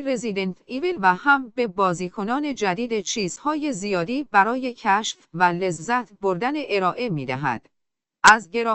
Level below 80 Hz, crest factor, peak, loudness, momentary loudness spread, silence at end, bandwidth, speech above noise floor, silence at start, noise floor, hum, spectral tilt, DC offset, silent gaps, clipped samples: -58 dBFS; 22 dB; 0 dBFS; -22 LUFS; 9 LU; 0 s; 8.8 kHz; 58 dB; 0 s; -80 dBFS; none; -4 dB/octave; under 0.1%; none; under 0.1%